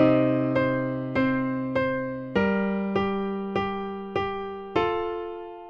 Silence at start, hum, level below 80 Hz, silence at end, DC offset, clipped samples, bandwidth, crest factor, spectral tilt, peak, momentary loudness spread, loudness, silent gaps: 0 s; none; -52 dBFS; 0 s; under 0.1%; under 0.1%; 6.6 kHz; 18 dB; -8.5 dB/octave; -8 dBFS; 7 LU; -26 LUFS; none